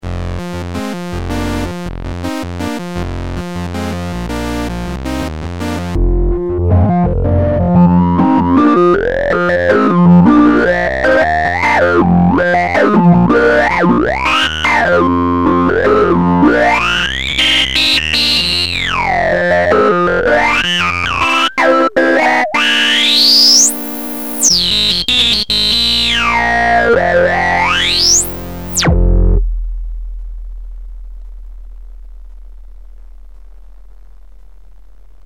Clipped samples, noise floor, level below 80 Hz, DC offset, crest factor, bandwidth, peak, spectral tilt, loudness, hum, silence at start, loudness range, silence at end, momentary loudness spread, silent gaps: under 0.1%; -40 dBFS; -24 dBFS; 2%; 12 dB; 19.5 kHz; 0 dBFS; -4 dB/octave; -11 LUFS; none; 0 s; 12 LU; 1.45 s; 13 LU; none